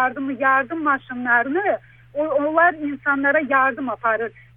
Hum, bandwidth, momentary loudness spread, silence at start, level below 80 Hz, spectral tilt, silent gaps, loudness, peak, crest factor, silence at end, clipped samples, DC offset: none; 3.8 kHz; 8 LU; 0 s; -60 dBFS; -8.5 dB/octave; none; -20 LUFS; -4 dBFS; 16 dB; 0.25 s; under 0.1%; under 0.1%